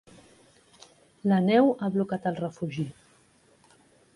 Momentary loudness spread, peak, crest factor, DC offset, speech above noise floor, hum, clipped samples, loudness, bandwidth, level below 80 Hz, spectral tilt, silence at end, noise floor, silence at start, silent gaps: 12 LU; -10 dBFS; 20 dB; under 0.1%; 37 dB; none; under 0.1%; -26 LUFS; 11.5 kHz; -68 dBFS; -8 dB/octave; 1.25 s; -62 dBFS; 1.25 s; none